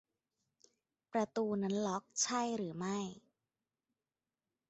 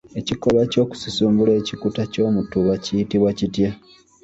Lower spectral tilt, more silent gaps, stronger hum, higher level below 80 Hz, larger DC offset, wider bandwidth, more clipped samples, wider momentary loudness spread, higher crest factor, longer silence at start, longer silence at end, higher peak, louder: second, -5 dB/octave vs -6.5 dB/octave; neither; neither; second, -80 dBFS vs -48 dBFS; neither; about the same, 8 kHz vs 8 kHz; neither; about the same, 6 LU vs 7 LU; first, 20 dB vs 14 dB; first, 1.15 s vs 0.15 s; first, 1.5 s vs 0.45 s; second, -22 dBFS vs -6 dBFS; second, -38 LUFS vs -20 LUFS